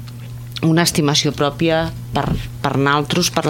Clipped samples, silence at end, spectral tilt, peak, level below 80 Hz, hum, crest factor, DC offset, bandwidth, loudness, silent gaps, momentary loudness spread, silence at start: under 0.1%; 0 s; -4.5 dB/octave; 0 dBFS; -38 dBFS; none; 18 dB; under 0.1%; 17 kHz; -17 LUFS; none; 8 LU; 0 s